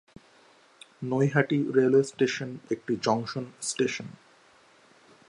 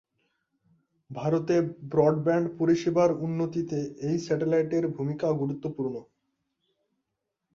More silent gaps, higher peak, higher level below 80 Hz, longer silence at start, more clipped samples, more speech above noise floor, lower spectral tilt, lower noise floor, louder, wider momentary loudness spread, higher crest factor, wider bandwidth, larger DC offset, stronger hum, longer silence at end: neither; about the same, -8 dBFS vs -8 dBFS; second, -72 dBFS vs -66 dBFS; about the same, 1 s vs 1.1 s; neither; second, 32 dB vs 57 dB; second, -5.5 dB/octave vs -8 dB/octave; second, -59 dBFS vs -83 dBFS; about the same, -27 LUFS vs -27 LUFS; first, 12 LU vs 9 LU; about the same, 20 dB vs 20 dB; first, 11.5 kHz vs 7.4 kHz; neither; neither; second, 1.15 s vs 1.55 s